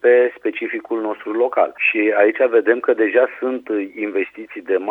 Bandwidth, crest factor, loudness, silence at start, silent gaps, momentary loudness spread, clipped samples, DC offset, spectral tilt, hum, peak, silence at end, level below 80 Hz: 3.9 kHz; 16 dB; -18 LUFS; 0.05 s; none; 9 LU; under 0.1%; under 0.1%; -6.5 dB/octave; none; -2 dBFS; 0 s; -72 dBFS